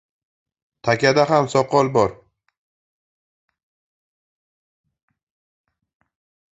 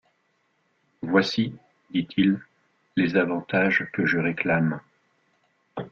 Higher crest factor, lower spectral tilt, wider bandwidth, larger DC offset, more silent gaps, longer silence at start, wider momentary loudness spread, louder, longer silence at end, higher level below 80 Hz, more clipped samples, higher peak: about the same, 22 dB vs 20 dB; second, -5.5 dB/octave vs -7 dB/octave; first, 8.2 kHz vs 7.2 kHz; neither; neither; second, 0.85 s vs 1 s; second, 7 LU vs 10 LU; first, -18 LUFS vs -24 LUFS; first, 4.45 s vs 0.05 s; about the same, -58 dBFS vs -62 dBFS; neither; first, -2 dBFS vs -8 dBFS